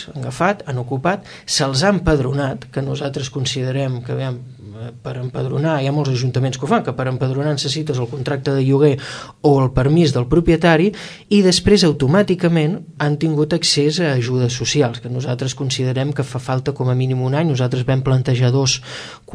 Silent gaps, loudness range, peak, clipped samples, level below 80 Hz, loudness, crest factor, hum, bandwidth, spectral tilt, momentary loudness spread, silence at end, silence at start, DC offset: none; 6 LU; -2 dBFS; under 0.1%; -38 dBFS; -18 LUFS; 16 dB; none; 11 kHz; -5.5 dB/octave; 10 LU; 0 s; 0 s; under 0.1%